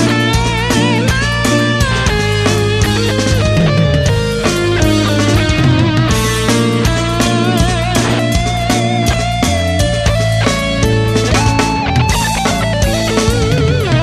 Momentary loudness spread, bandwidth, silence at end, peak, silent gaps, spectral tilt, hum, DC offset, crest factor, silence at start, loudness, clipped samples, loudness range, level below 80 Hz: 2 LU; 14 kHz; 0 s; 0 dBFS; none; -5 dB/octave; none; under 0.1%; 12 dB; 0 s; -13 LUFS; under 0.1%; 1 LU; -22 dBFS